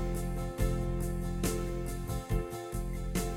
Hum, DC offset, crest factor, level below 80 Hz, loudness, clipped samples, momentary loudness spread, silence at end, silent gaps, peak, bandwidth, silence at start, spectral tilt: none; under 0.1%; 16 dB; -36 dBFS; -36 LUFS; under 0.1%; 5 LU; 0 s; none; -18 dBFS; 16.5 kHz; 0 s; -6 dB/octave